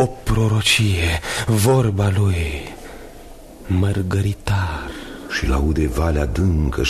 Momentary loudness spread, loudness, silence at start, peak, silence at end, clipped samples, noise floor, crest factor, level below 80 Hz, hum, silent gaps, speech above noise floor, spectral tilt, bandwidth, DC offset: 16 LU; -19 LUFS; 0 s; -4 dBFS; 0 s; under 0.1%; -38 dBFS; 16 dB; -28 dBFS; none; none; 20 dB; -5.5 dB/octave; 13.5 kHz; under 0.1%